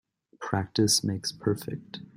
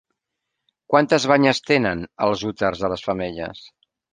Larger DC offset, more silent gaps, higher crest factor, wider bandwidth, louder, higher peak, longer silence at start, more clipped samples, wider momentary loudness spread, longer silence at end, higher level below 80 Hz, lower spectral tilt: neither; neither; about the same, 20 dB vs 20 dB; first, 16 kHz vs 9.8 kHz; second, -27 LUFS vs -20 LUFS; second, -10 dBFS vs -2 dBFS; second, 0.4 s vs 0.9 s; neither; first, 15 LU vs 10 LU; second, 0.1 s vs 0.45 s; second, -62 dBFS vs -52 dBFS; about the same, -4 dB/octave vs -5 dB/octave